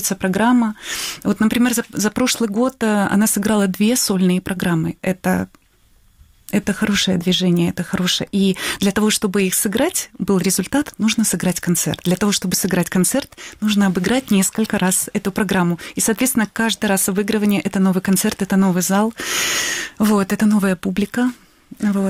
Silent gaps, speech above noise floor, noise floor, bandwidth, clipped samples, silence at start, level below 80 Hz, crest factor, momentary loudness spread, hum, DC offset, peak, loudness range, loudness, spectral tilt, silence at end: none; 36 dB; -54 dBFS; 16.5 kHz; under 0.1%; 0 s; -48 dBFS; 12 dB; 5 LU; none; under 0.1%; -6 dBFS; 2 LU; -18 LUFS; -4 dB/octave; 0 s